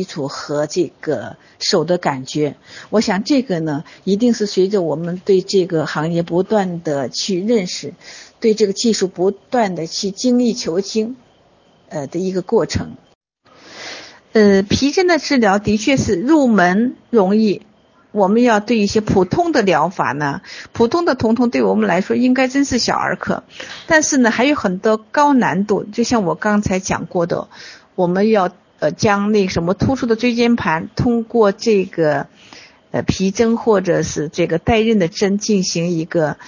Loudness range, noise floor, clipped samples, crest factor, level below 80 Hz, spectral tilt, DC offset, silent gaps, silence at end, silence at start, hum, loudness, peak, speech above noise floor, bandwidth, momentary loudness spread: 4 LU; -52 dBFS; under 0.1%; 16 dB; -44 dBFS; -5 dB/octave; under 0.1%; 13.15-13.21 s; 0 s; 0 s; none; -17 LUFS; 0 dBFS; 36 dB; 7.4 kHz; 10 LU